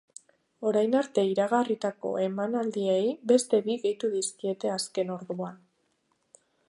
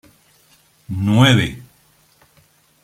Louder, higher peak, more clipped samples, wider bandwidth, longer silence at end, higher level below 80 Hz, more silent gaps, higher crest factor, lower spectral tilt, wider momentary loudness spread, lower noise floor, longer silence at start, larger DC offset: second, -28 LUFS vs -16 LUFS; second, -10 dBFS vs 0 dBFS; neither; second, 11.5 kHz vs 15 kHz; about the same, 1.15 s vs 1.2 s; second, -82 dBFS vs -48 dBFS; neither; about the same, 18 dB vs 20 dB; about the same, -4.5 dB/octave vs -5.5 dB/octave; second, 8 LU vs 18 LU; first, -73 dBFS vs -56 dBFS; second, 0.6 s vs 0.9 s; neither